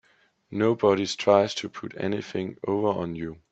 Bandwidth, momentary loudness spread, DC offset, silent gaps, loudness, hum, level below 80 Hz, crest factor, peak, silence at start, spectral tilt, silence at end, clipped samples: 8.4 kHz; 12 LU; under 0.1%; none; -26 LUFS; none; -64 dBFS; 22 dB; -4 dBFS; 0.5 s; -5.5 dB/octave; 0.15 s; under 0.1%